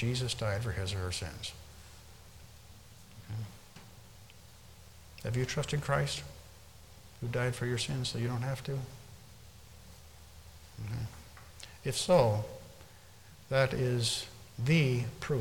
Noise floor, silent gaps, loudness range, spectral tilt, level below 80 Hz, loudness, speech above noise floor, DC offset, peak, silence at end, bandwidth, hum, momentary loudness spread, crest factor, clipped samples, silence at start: -55 dBFS; none; 14 LU; -5 dB/octave; -56 dBFS; -33 LUFS; 24 dB; under 0.1%; -14 dBFS; 0 s; 18 kHz; none; 25 LU; 22 dB; under 0.1%; 0 s